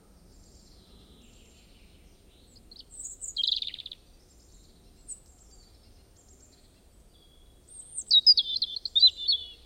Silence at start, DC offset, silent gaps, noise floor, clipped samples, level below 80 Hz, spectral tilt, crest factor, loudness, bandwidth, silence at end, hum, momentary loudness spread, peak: 2.95 s; under 0.1%; none; -58 dBFS; under 0.1%; -58 dBFS; 0.5 dB/octave; 22 dB; -22 LUFS; 16 kHz; 0.15 s; none; 26 LU; -8 dBFS